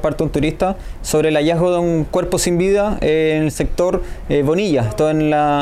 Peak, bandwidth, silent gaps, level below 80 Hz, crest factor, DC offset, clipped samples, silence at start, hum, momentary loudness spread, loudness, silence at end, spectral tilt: -6 dBFS; 15.5 kHz; none; -30 dBFS; 10 dB; under 0.1%; under 0.1%; 0 s; none; 5 LU; -17 LUFS; 0 s; -5.5 dB/octave